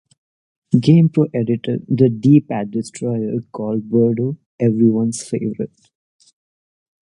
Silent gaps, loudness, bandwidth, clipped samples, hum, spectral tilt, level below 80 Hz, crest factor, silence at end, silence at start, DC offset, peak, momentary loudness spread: 4.46-4.58 s; -17 LUFS; 11 kHz; under 0.1%; none; -8 dB/octave; -60 dBFS; 18 dB; 1.4 s; 0.7 s; under 0.1%; 0 dBFS; 11 LU